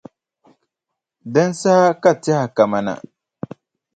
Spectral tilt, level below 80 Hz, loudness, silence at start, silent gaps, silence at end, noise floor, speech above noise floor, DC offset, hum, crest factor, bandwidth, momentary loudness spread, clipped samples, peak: -6 dB/octave; -64 dBFS; -17 LUFS; 1.25 s; none; 1 s; -82 dBFS; 66 dB; under 0.1%; none; 18 dB; 9.2 kHz; 20 LU; under 0.1%; 0 dBFS